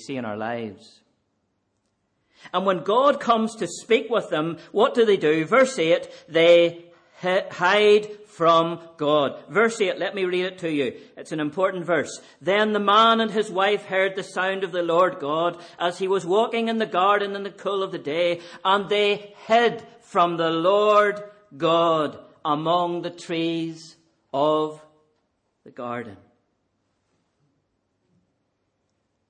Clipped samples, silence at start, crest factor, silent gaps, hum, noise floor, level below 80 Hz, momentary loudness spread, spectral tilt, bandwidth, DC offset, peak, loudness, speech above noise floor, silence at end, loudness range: under 0.1%; 0 s; 18 dB; none; none; -73 dBFS; -72 dBFS; 12 LU; -4.5 dB/octave; 9.8 kHz; under 0.1%; -6 dBFS; -22 LUFS; 51 dB; 3.15 s; 9 LU